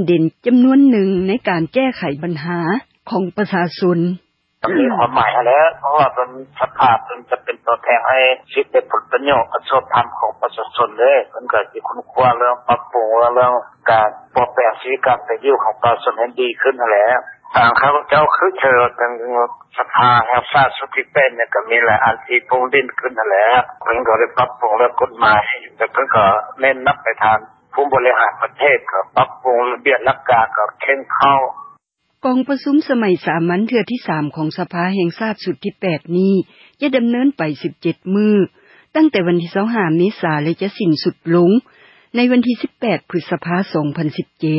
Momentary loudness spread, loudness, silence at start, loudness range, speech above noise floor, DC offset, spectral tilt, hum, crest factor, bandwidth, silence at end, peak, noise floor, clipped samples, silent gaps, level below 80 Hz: 9 LU; -16 LUFS; 0 s; 4 LU; 42 dB; under 0.1%; -10 dB/octave; none; 14 dB; 5.8 kHz; 0 s; 0 dBFS; -57 dBFS; under 0.1%; none; -54 dBFS